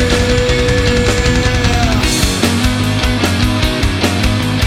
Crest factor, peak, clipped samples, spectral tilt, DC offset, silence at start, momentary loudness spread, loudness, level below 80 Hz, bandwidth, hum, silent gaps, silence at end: 12 dB; 0 dBFS; under 0.1%; -4.5 dB/octave; under 0.1%; 0 s; 2 LU; -13 LUFS; -20 dBFS; 16.5 kHz; none; none; 0 s